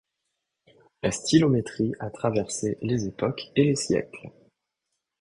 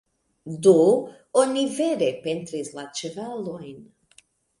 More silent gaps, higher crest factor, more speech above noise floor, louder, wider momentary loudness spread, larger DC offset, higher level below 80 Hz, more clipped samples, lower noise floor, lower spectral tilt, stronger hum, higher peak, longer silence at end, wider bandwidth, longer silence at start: neither; about the same, 20 dB vs 20 dB; first, 57 dB vs 36 dB; second, -26 LUFS vs -23 LUFS; second, 9 LU vs 17 LU; neither; first, -56 dBFS vs -70 dBFS; neither; first, -82 dBFS vs -59 dBFS; about the same, -5.5 dB/octave vs -5 dB/octave; neither; about the same, -6 dBFS vs -4 dBFS; first, 0.9 s vs 0.75 s; about the same, 11.5 kHz vs 11.5 kHz; first, 1.05 s vs 0.45 s